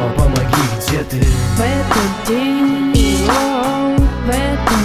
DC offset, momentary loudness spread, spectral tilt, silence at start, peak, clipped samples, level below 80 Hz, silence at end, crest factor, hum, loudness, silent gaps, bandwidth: under 0.1%; 3 LU; -5.5 dB/octave; 0 s; -2 dBFS; under 0.1%; -20 dBFS; 0 s; 12 dB; none; -15 LUFS; none; 16 kHz